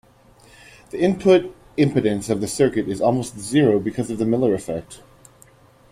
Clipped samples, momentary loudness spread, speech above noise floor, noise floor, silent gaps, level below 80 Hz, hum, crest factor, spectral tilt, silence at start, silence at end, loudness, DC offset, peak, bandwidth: under 0.1%; 9 LU; 32 dB; -51 dBFS; none; -52 dBFS; none; 18 dB; -6 dB/octave; 0.95 s; 0.95 s; -20 LUFS; under 0.1%; -2 dBFS; 15.5 kHz